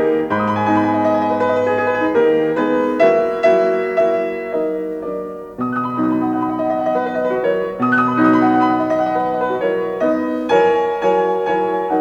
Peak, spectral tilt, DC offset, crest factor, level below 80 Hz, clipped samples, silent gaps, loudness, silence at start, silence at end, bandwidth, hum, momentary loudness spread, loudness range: -2 dBFS; -7 dB/octave; under 0.1%; 14 dB; -54 dBFS; under 0.1%; none; -17 LUFS; 0 s; 0 s; 7.8 kHz; none; 7 LU; 4 LU